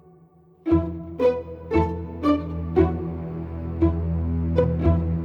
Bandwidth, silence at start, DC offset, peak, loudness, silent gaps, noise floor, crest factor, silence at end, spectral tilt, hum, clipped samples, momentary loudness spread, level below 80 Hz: 5.4 kHz; 0.65 s; under 0.1%; -6 dBFS; -24 LUFS; none; -53 dBFS; 18 dB; 0 s; -10.5 dB/octave; none; under 0.1%; 10 LU; -34 dBFS